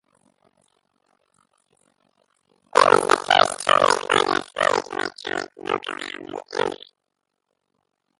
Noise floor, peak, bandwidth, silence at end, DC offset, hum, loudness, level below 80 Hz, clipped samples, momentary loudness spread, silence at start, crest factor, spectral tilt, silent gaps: -79 dBFS; 0 dBFS; 11.5 kHz; 1.45 s; under 0.1%; none; -21 LUFS; -64 dBFS; under 0.1%; 14 LU; 2.75 s; 24 dB; -2 dB/octave; none